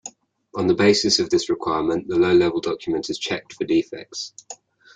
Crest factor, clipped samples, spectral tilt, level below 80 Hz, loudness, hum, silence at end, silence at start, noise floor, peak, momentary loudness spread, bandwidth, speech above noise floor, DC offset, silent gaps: 20 dB; under 0.1%; -4 dB/octave; -58 dBFS; -21 LUFS; none; 0.4 s; 0.05 s; -43 dBFS; -2 dBFS; 17 LU; 9.2 kHz; 22 dB; under 0.1%; none